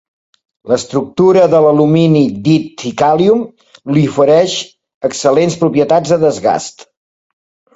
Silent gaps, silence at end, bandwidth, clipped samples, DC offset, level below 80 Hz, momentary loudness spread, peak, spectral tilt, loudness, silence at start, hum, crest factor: 4.94-5.01 s; 1.05 s; 8 kHz; under 0.1%; under 0.1%; -52 dBFS; 11 LU; 0 dBFS; -6 dB/octave; -12 LUFS; 0.65 s; none; 12 dB